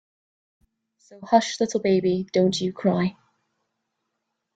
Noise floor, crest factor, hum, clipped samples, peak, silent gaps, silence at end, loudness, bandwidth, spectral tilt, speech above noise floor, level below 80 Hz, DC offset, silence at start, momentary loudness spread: -79 dBFS; 22 dB; none; under 0.1%; -4 dBFS; none; 1.45 s; -23 LUFS; 9 kHz; -5.5 dB/octave; 57 dB; -64 dBFS; under 0.1%; 1.1 s; 4 LU